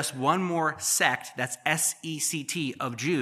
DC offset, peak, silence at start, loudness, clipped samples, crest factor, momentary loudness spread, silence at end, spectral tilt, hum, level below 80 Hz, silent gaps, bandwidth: under 0.1%; -6 dBFS; 0 s; -27 LUFS; under 0.1%; 22 dB; 7 LU; 0 s; -2.5 dB/octave; none; -76 dBFS; none; 15 kHz